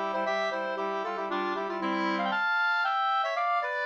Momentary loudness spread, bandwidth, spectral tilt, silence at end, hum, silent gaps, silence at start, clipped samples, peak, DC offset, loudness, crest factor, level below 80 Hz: 5 LU; 8.4 kHz; -4.5 dB/octave; 0 s; none; none; 0 s; under 0.1%; -18 dBFS; under 0.1%; -28 LUFS; 12 dB; -82 dBFS